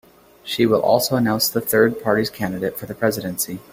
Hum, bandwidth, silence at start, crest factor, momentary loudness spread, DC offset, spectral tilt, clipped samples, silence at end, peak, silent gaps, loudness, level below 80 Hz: none; 16.5 kHz; 0.45 s; 18 dB; 9 LU; under 0.1%; -4 dB/octave; under 0.1%; 0.1 s; -2 dBFS; none; -20 LUFS; -54 dBFS